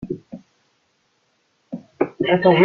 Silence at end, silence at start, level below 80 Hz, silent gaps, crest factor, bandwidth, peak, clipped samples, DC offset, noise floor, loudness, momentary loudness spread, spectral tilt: 0 s; 0 s; -58 dBFS; none; 20 dB; 4.9 kHz; -2 dBFS; under 0.1%; under 0.1%; -66 dBFS; -21 LUFS; 24 LU; -8.5 dB/octave